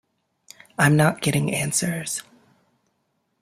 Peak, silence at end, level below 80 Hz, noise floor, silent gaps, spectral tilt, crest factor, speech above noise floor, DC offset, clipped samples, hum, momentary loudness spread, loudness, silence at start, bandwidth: -4 dBFS; 1.2 s; -58 dBFS; -72 dBFS; none; -4.5 dB/octave; 20 dB; 51 dB; under 0.1%; under 0.1%; none; 13 LU; -21 LUFS; 0.8 s; 16 kHz